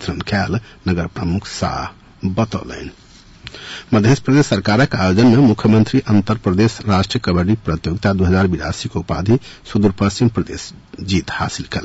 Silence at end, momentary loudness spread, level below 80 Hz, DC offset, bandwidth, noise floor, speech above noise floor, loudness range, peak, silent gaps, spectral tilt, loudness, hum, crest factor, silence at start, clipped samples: 0 s; 16 LU; -40 dBFS; under 0.1%; 8 kHz; -39 dBFS; 23 dB; 8 LU; -4 dBFS; none; -6.5 dB/octave; -17 LUFS; none; 12 dB; 0 s; under 0.1%